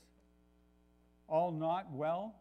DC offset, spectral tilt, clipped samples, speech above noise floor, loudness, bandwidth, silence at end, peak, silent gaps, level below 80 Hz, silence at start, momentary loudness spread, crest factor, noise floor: under 0.1%; -8.5 dB/octave; under 0.1%; 33 dB; -37 LUFS; 6 kHz; 0.1 s; -22 dBFS; none; -72 dBFS; 1.3 s; 4 LU; 18 dB; -69 dBFS